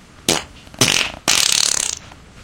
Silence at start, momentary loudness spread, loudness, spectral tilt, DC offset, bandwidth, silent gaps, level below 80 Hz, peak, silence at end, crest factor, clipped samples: 0.2 s; 9 LU; -16 LUFS; -0.5 dB/octave; under 0.1%; over 20 kHz; none; -46 dBFS; 0 dBFS; 0 s; 20 dB; under 0.1%